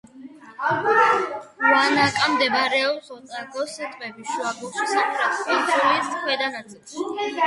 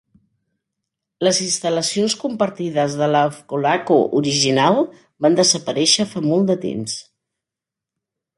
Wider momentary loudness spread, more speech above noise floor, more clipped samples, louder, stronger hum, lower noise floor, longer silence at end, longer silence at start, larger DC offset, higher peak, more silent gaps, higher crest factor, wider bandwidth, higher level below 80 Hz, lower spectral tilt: first, 15 LU vs 7 LU; second, 21 dB vs 68 dB; neither; second, -21 LUFS vs -18 LUFS; neither; second, -43 dBFS vs -86 dBFS; second, 0 s vs 1.35 s; second, 0.15 s vs 1.2 s; neither; about the same, -4 dBFS vs -2 dBFS; neither; about the same, 18 dB vs 18 dB; about the same, 11.5 kHz vs 11.5 kHz; about the same, -66 dBFS vs -64 dBFS; about the same, -3 dB/octave vs -3.5 dB/octave